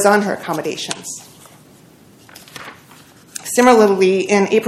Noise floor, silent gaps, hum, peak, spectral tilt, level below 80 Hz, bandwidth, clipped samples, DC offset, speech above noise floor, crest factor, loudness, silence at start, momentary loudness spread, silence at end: -46 dBFS; none; none; 0 dBFS; -4 dB/octave; -60 dBFS; 15.5 kHz; 0.1%; under 0.1%; 31 dB; 18 dB; -15 LUFS; 0 s; 23 LU; 0 s